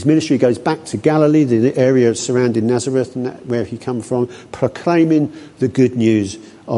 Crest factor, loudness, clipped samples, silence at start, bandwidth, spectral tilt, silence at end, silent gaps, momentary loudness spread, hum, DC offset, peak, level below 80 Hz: 14 dB; -16 LUFS; under 0.1%; 0 s; 11.5 kHz; -6.5 dB/octave; 0 s; none; 10 LU; none; under 0.1%; -2 dBFS; -52 dBFS